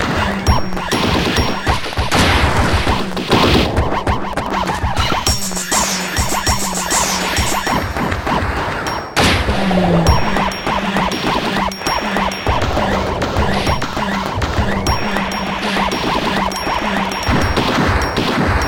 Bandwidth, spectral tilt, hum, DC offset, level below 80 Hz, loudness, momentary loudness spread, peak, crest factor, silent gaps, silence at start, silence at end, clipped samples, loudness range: 17.5 kHz; -4 dB/octave; none; 0.7%; -26 dBFS; -16 LUFS; 5 LU; 0 dBFS; 16 dB; none; 0 s; 0 s; under 0.1%; 2 LU